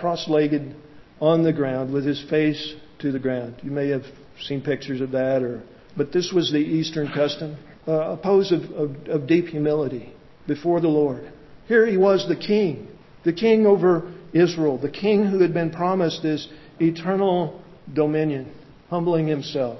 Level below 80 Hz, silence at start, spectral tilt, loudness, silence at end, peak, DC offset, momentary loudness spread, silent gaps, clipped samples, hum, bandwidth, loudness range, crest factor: -58 dBFS; 0 s; -7 dB/octave; -22 LUFS; 0 s; -6 dBFS; under 0.1%; 12 LU; none; under 0.1%; none; 6.2 kHz; 5 LU; 16 dB